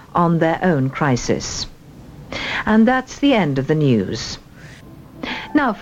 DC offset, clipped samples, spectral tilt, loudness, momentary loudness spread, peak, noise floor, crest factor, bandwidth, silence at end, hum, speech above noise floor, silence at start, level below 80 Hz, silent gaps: under 0.1%; under 0.1%; -5.5 dB/octave; -18 LUFS; 13 LU; -4 dBFS; -40 dBFS; 16 dB; 8.6 kHz; 0 s; none; 23 dB; 0 s; -42 dBFS; none